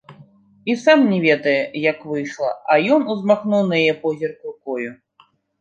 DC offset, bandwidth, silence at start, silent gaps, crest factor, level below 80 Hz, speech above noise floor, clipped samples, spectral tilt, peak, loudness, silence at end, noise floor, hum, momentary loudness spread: under 0.1%; 8.2 kHz; 0.1 s; none; 18 dB; -70 dBFS; 39 dB; under 0.1%; -6 dB/octave; -2 dBFS; -18 LUFS; 0.65 s; -57 dBFS; none; 13 LU